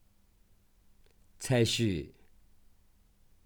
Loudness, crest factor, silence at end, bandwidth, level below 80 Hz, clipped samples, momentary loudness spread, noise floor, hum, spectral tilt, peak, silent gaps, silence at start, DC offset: -30 LUFS; 20 dB; 1.4 s; 20 kHz; -58 dBFS; under 0.1%; 16 LU; -64 dBFS; none; -5 dB/octave; -16 dBFS; none; 1.4 s; under 0.1%